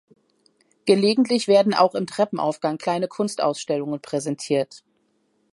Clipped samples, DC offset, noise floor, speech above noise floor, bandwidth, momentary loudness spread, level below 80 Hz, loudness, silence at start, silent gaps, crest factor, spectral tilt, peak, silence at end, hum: under 0.1%; under 0.1%; -67 dBFS; 46 dB; 11.5 kHz; 9 LU; -74 dBFS; -22 LUFS; 0.85 s; none; 20 dB; -5 dB/octave; -4 dBFS; 0.75 s; none